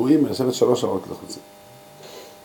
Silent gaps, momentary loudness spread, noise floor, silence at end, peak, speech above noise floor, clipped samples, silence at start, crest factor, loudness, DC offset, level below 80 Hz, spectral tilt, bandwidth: none; 22 LU; -44 dBFS; 0.1 s; -4 dBFS; 23 dB; under 0.1%; 0 s; 18 dB; -21 LUFS; under 0.1%; -66 dBFS; -6 dB/octave; 17.5 kHz